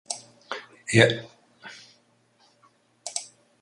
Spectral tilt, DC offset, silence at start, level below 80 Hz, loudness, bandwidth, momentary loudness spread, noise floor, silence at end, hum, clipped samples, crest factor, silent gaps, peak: -4 dB/octave; under 0.1%; 0.1 s; -62 dBFS; -25 LUFS; 11.5 kHz; 27 LU; -64 dBFS; 0.35 s; none; under 0.1%; 26 dB; none; -2 dBFS